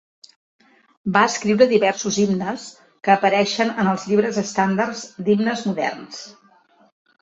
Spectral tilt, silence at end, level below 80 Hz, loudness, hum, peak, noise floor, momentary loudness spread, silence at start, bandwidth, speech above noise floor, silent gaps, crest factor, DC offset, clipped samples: -4.5 dB/octave; 0.9 s; -62 dBFS; -20 LUFS; none; -2 dBFS; -55 dBFS; 16 LU; 1.05 s; 8 kHz; 36 dB; none; 20 dB; under 0.1%; under 0.1%